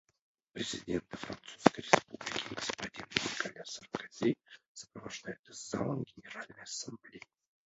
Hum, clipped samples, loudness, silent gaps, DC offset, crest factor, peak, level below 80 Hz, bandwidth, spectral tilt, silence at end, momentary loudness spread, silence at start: none; under 0.1%; -36 LUFS; 4.68-4.75 s, 5.39-5.44 s; under 0.1%; 34 dB; -4 dBFS; -68 dBFS; 8 kHz; -3 dB/octave; 0.45 s; 18 LU; 0.55 s